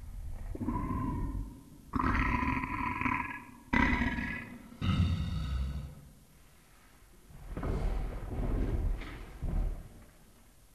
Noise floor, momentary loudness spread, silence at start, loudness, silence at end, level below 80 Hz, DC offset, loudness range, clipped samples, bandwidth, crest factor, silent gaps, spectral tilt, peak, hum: -60 dBFS; 16 LU; 0 s; -35 LUFS; 0.45 s; -38 dBFS; under 0.1%; 7 LU; under 0.1%; 13.5 kHz; 22 dB; none; -7 dB/octave; -12 dBFS; none